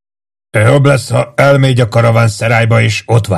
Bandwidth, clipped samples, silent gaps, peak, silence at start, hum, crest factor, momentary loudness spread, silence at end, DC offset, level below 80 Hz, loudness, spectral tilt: 12.5 kHz; 0.8%; none; 0 dBFS; 0.55 s; none; 10 dB; 4 LU; 0 s; under 0.1%; -44 dBFS; -10 LUFS; -6 dB/octave